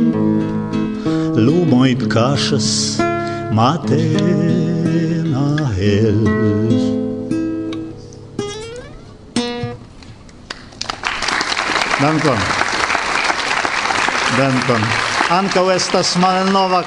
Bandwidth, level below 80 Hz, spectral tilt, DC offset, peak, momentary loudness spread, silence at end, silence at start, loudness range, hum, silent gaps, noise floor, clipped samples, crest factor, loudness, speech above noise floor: 11 kHz; -44 dBFS; -5 dB/octave; under 0.1%; 0 dBFS; 12 LU; 0 s; 0 s; 9 LU; none; none; -37 dBFS; under 0.1%; 16 dB; -16 LUFS; 23 dB